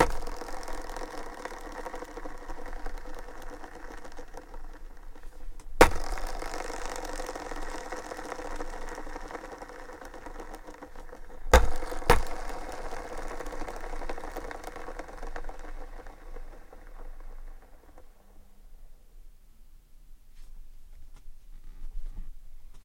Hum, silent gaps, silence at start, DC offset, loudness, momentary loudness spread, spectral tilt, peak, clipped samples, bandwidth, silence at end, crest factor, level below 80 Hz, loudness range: none; none; 0 s; under 0.1%; -34 LUFS; 24 LU; -4.5 dB/octave; -4 dBFS; under 0.1%; 17 kHz; 0 s; 28 dB; -36 dBFS; 22 LU